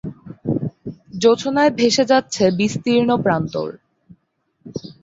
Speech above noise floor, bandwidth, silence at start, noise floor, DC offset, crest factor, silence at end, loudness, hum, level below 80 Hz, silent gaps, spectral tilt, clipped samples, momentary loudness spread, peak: 50 dB; 8 kHz; 0.05 s; -67 dBFS; under 0.1%; 18 dB; 0.1 s; -18 LUFS; none; -54 dBFS; none; -5 dB/octave; under 0.1%; 17 LU; -2 dBFS